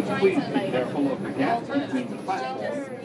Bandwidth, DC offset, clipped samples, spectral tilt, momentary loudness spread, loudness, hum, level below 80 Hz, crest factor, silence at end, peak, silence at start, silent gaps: 11 kHz; under 0.1%; under 0.1%; -6.5 dB/octave; 7 LU; -26 LUFS; none; -68 dBFS; 16 dB; 0 s; -10 dBFS; 0 s; none